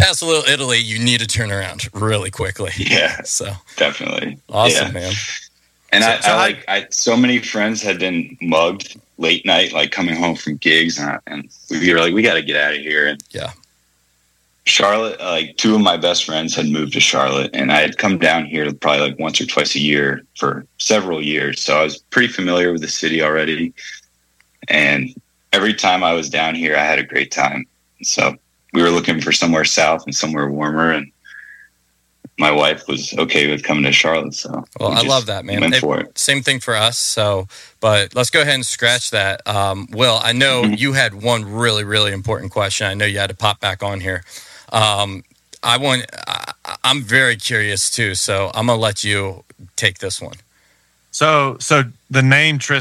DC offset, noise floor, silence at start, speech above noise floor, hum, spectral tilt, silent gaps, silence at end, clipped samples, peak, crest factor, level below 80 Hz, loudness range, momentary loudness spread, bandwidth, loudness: under 0.1%; -62 dBFS; 0 s; 45 dB; none; -3 dB/octave; none; 0 s; under 0.1%; 0 dBFS; 18 dB; -50 dBFS; 3 LU; 10 LU; 15.5 kHz; -16 LUFS